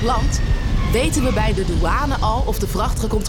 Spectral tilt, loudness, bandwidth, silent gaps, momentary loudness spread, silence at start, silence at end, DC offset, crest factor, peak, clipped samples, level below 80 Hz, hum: -5.5 dB/octave; -20 LUFS; 18 kHz; none; 3 LU; 0 s; 0 s; under 0.1%; 8 dB; -8 dBFS; under 0.1%; -20 dBFS; none